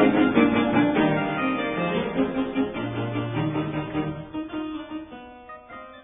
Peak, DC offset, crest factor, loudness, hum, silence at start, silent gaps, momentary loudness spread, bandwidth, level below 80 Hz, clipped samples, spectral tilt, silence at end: -6 dBFS; under 0.1%; 20 dB; -25 LUFS; none; 0 s; none; 21 LU; 3.9 kHz; -52 dBFS; under 0.1%; -10.5 dB/octave; 0.05 s